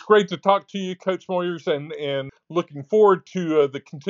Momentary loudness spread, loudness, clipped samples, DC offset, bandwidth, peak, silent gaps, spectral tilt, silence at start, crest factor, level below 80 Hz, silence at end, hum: 10 LU; -22 LUFS; under 0.1%; under 0.1%; 7.4 kHz; -2 dBFS; none; -4.5 dB/octave; 0.05 s; 18 dB; -74 dBFS; 0 s; none